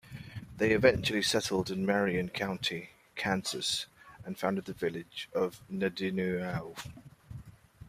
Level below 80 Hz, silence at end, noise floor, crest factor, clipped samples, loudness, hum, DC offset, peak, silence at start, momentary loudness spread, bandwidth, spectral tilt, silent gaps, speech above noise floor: -60 dBFS; 0 s; -52 dBFS; 24 dB; under 0.1%; -32 LUFS; none; under 0.1%; -10 dBFS; 0.05 s; 18 LU; 15.5 kHz; -4.5 dB/octave; none; 20 dB